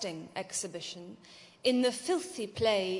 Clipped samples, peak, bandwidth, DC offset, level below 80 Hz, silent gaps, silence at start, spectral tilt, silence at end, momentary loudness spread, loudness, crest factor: under 0.1%; -14 dBFS; 11.5 kHz; under 0.1%; -72 dBFS; none; 0 s; -3 dB/octave; 0 s; 19 LU; -33 LUFS; 20 dB